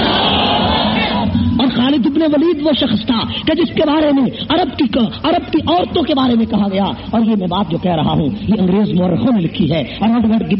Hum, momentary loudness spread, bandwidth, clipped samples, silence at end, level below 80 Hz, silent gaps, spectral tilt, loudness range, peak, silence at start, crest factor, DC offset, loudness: none; 4 LU; 5.8 kHz; under 0.1%; 0 s; -36 dBFS; none; -4.5 dB/octave; 1 LU; -2 dBFS; 0 s; 12 dB; under 0.1%; -14 LUFS